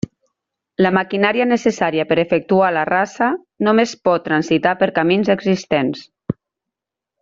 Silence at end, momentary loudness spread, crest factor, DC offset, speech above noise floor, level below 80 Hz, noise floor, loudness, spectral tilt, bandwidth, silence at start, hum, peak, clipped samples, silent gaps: 0.9 s; 13 LU; 16 dB; under 0.1%; 68 dB; -56 dBFS; -84 dBFS; -17 LUFS; -6 dB/octave; 7.6 kHz; 0.8 s; none; -2 dBFS; under 0.1%; none